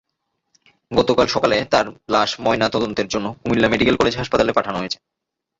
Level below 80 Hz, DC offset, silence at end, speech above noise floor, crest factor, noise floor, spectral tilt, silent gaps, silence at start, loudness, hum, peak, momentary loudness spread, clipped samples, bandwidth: -46 dBFS; under 0.1%; 0.65 s; 57 dB; 18 dB; -75 dBFS; -4.5 dB/octave; none; 0.9 s; -19 LUFS; none; -2 dBFS; 8 LU; under 0.1%; 8 kHz